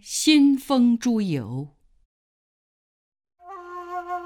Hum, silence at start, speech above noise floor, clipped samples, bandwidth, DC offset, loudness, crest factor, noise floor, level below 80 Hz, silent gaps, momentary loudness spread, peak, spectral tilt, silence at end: none; 0.05 s; over 70 dB; under 0.1%; 17.5 kHz; under 0.1%; -20 LUFS; 20 dB; under -90 dBFS; -64 dBFS; 2.05-3.12 s; 21 LU; -4 dBFS; -4.5 dB/octave; 0 s